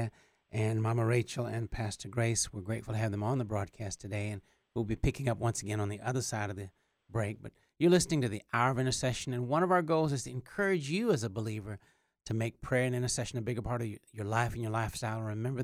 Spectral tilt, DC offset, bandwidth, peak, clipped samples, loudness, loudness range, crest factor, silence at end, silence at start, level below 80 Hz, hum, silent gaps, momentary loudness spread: -5.5 dB/octave; under 0.1%; 15.5 kHz; -12 dBFS; under 0.1%; -33 LUFS; 5 LU; 20 dB; 0 s; 0 s; -52 dBFS; none; none; 12 LU